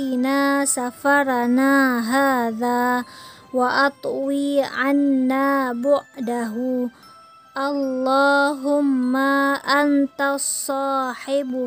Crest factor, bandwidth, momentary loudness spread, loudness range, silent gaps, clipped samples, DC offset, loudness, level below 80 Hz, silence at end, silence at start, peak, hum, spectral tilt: 16 dB; 16 kHz; 8 LU; 3 LU; none; under 0.1%; under 0.1%; -20 LUFS; -70 dBFS; 0 s; 0 s; -6 dBFS; none; -2.5 dB/octave